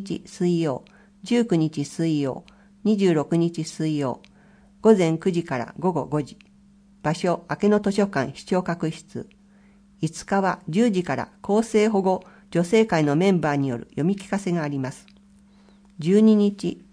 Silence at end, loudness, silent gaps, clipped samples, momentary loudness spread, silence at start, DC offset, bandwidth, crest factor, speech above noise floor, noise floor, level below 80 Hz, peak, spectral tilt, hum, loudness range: 0.15 s; -23 LUFS; none; under 0.1%; 11 LU; 0 s; under 0.1%; 10.5 kHz; 20 dB; 32 dB; -54 dBFS; -60 dBFS; -4 dBFS; -6.5 dB/octave; none; 4 LU